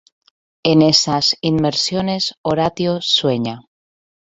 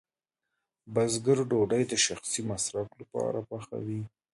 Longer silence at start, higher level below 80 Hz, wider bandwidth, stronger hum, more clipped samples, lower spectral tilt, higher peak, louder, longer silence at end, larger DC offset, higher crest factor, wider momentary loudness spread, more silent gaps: second, 0.65 s vs 0.85 s; first, -52 dBFS vs -64 dBFS; second, 8.4 kHz vs 11.5 kHz; neither; neither; about the same, -4.5 dB/octave vs -4 dB/octave; first, 0 dBFS vs -12 dBFS; first, -16 LUFS vs -30 LUFS; first, 0.7 s vs 0.25 s; neither; about the same, 18 dB vs 18 dB; about the same, 9 LU vs 11 LU; first, 2.38-2.44 s vs none